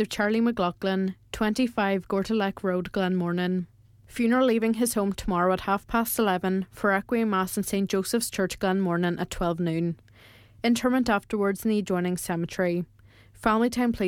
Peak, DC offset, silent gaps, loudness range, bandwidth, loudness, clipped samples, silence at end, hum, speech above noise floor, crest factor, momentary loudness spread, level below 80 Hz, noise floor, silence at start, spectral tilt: -8 dBFS; under 0.1%; none; 2 LU; 18 kHz; -26 LUFS; under 0.1%; 0 s; none; 28 dB; 18 dB; 6 LU; -50 dBFS; -53 dBFS; 0 s; -5.5 dB/octave